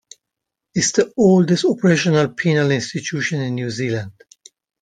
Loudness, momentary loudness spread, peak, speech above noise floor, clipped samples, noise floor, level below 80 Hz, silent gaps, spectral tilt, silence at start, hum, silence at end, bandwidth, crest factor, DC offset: -18 LUFS; 10 LU; -2 dBFS; 65 dB; under 0.1%; -82 dBFS; -58 dBFS; none; -5 dB/octave; 0.75 s; none; 0.7 s; 9.6 kHz; 18 dB; under 0.1%